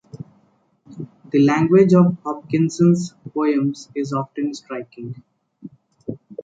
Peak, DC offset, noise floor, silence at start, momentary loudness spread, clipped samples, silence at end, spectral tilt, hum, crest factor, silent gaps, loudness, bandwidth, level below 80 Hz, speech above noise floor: -2 dBFS; under 0.1%; -60 dBFS; 0.15 s; 23 LU; under 0.1%; 0 s; -7.5 dB/octave; none; 18 dB; none; -18 LUFS; 7.8 kHz; -64 dBFS; 42 dB